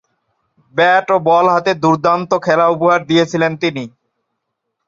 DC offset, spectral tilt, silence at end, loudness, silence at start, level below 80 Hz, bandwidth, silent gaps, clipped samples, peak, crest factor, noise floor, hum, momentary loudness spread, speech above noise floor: under 0.1%; -5.5 dB/octave; 1 s; -14 LUFS; 0.75 s; -60 dBFS; 7.6 kHz; none; under 0.1%; -2 dBFS; 14 dB; -74 dBFS; none; 8 LU; 60 dB